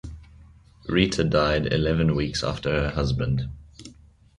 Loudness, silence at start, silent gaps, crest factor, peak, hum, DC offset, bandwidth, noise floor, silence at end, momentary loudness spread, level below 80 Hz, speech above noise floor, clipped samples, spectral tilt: -24 LUFS; 0.05 s; none; 20 dB; -6 dBFS; none; under 0.1%; 11 kHz; -51 dBFS; 0.45 s; 18 LU; -38 dBFS; 28 dB; under 0.1%; -6 dB/octave